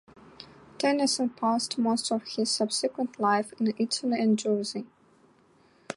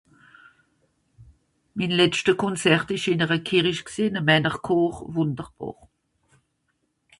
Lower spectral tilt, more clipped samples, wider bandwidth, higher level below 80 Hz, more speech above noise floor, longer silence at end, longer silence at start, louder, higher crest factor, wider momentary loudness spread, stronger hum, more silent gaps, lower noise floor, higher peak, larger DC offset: second, -3.5 dB/octave vs -5 dB/octave; neither; about the same, 11.5 kHz vs 11.5 kHz; second, -74 dBFS vs -58 dBFS; second, 34 dB vs 50 dB; second, 0.05 s vs 1.5 s; second, 0.4 s vs 1.2 s; second, -27 LUFS vs -22 LUFS; about the same, 16 dB vs 20 dB; first, 16 LU vs 13 LU; neither; neither; second, -61 dBFS vs -73 dBFS; second, -12 dBFS vs -6 dBFS; neither